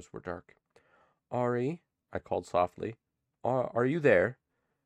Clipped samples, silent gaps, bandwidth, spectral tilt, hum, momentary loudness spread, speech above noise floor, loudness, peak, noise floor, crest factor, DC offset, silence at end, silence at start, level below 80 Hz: under 0.1%; none; 10 kHz; -7.5 dB/octave; none; 17 LU; 38 dB; -31 LUFS; -10 dBFS; -68 dBFS; 22 dB; under 0.1%; 0.5 s; 0 s; -66 dBFS